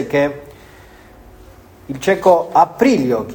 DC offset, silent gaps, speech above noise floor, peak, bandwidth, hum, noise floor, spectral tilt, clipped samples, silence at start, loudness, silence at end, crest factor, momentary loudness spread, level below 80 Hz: under 0.1%; none; 27 dB; 0 dBFS; 19.5 kHz; none; -42 dBFS; -6 dB/octave; under 0.1%; 0 s; -15 LUFS; 0 s; 16 dB; 12 LU; -48 dBFS